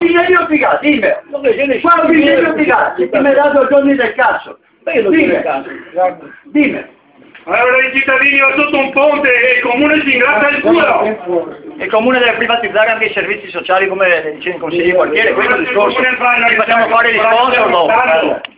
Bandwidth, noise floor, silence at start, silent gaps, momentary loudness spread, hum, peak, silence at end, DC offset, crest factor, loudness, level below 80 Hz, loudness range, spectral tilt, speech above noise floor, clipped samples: 4 kHz; -41 dBFS; 0 s; none; 8 LU; none; 0 dBFS; 0.1 s; under 0.1%; 12 dB; -11 LUFS; -50 dBFS; 4 LU; -7.5 dB/octave; 30 dB; under 0.1%